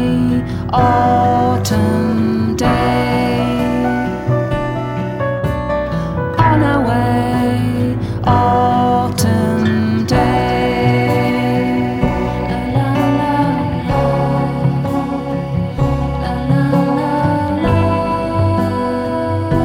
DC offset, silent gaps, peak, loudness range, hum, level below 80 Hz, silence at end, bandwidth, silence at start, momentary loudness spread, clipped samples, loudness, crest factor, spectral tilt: under 0.1%; none; 0 dBFS; 2 LU; none; -30 dBFS; 0 s; 17 kHz; 0 s; 6 LU; under 0.1%; -15 LUFS; 14 dB; -7 dB/octave